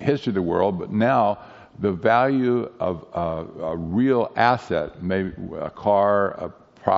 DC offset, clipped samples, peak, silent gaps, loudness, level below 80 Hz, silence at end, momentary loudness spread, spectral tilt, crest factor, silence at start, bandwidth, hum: under 0.1%; under 0.1%; -2 dBFS; none; -22 LUFS; -52 dBFS; 0 s; 11 LU; -5.5 dB/octave; 20 dB; 0 s; 7.6 kHz; none